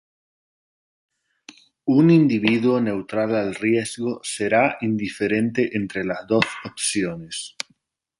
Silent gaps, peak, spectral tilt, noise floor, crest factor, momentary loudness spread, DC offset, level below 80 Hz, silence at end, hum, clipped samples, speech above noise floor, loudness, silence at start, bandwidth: none; -2 dBFS; -5 dB/octave; -65 dBFS; 20 dB; 13 LU; under 0.1%; -60 dBFS; 0.7 s; none; under 0.1%; 44 dB; -21 LUFS; 1.85 s; 11.5 kHz